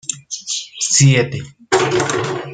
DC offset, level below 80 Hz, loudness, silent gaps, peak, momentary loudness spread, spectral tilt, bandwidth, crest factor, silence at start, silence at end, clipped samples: under 0.1%; -52 dBFS; -16 LUFS; none; 0 dBFS; 13 LU; -4 dB/octave; 9.6 kHz; 16 dB; 0.1 s; 0 s; under 0.1%